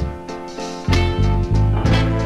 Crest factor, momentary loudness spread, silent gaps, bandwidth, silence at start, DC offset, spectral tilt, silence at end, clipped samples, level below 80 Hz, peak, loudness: 16 dB; 12 LU; none; 11 kHz; 0 s; 0.4%; -6.5 dB/octave; 0 s; under 0.1%; -24 dBFS; -2 dBFS; -19 LUFS